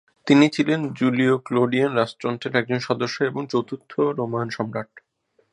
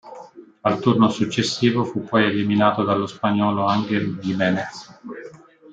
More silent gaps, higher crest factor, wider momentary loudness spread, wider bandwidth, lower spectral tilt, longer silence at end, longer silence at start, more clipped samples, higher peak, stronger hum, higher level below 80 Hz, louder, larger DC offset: neither; about the same, 20 dB vs 18 dB; second, 10 LU vs 18 LU; first, 10.5 kHz vs 9 kHz; about the same, -6.5 dB/octave vs -6 dB/octave; first, 0.55 s vs 0 s; first, 0.25 s vs 0.05 s; neither; about the same, -2 dBFS vs -4 dBFS; neither; about the same, -68 dBFS vs -64 dBFS; about the same, -22 LUFS vs -20 LUFS; neither